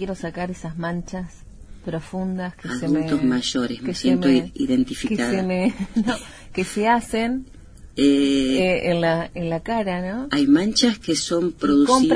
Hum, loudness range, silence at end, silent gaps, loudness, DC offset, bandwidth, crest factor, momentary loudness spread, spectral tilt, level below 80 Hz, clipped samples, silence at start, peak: none; 5 LU; 0 s; none; -22 LUFS; under 0.1%; 11 kHz; 16 dB; 12 LU; -5 dB/octave; -44 dBFS; under 0.1%; 0 s; -4 dBFS